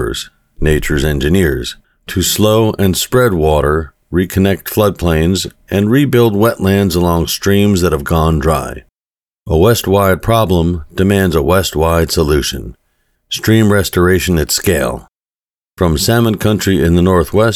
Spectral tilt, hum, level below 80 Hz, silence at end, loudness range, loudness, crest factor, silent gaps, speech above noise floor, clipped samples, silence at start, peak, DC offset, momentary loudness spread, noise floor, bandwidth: -5.5 dB/octave; none; -28 dBFS; 0 s; 2 LU; -13 LUFS; 12 dB; 9.00-9.10 s, 15.26-15.30 s, 15.50-15.54 s; over 78 dB; under 0.1%; 0 s; 0 dBFS; under 0.1%; 8 LU; under -90 dBFS; 18.5 kHz